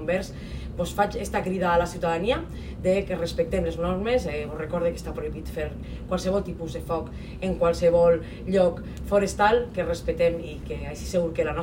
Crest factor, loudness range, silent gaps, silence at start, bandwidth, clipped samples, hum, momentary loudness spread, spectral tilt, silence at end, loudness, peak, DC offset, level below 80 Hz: 18 dB; 5 LU; none; 0 s; 16 kHz; under 0.1%; none; 12 LU; -6 dB/octave; 0 s; -26 LUFS; -8 dBFS; under 0.1%; -38 dBFS